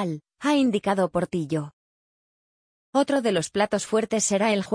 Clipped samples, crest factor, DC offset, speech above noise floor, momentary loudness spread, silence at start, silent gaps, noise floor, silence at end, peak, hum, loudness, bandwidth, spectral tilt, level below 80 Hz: under 0.1%; 16 dB; under 0.1%; over 67 dB; 8 LU; 0 s; 1.73-2.93 s; under -90 dBFS; 0 s; -8 dBFS; none; -24 LUFS; 10.5 kHz; -4.5 dB/octave; -62 dBFS